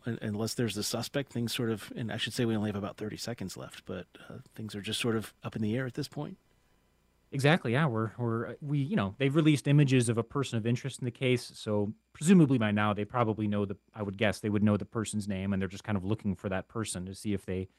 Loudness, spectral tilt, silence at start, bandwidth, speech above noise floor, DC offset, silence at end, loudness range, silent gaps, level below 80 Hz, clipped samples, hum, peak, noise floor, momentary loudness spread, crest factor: -31 LUFS; -6 dB/octave; 0.05 s; 16 kHz; 39 dB; under 0.1%; 0.15 s; 8 LU; none; -64 dBFS; under 0.1%; none; -8 dBFS; -69 dBFS; 14 LU; 22 dB